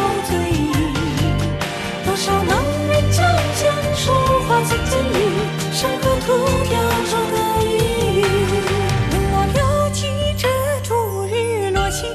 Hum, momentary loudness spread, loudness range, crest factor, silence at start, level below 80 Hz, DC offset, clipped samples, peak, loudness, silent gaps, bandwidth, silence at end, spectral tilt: none; 4 LU; 2 LU; 12 dB; 0 s; -30 dBFS; under 0.1%; under 0.1%; -6 dBFS; -18 LUFS; none; 14 kHz; 0 s; -5 dB/octave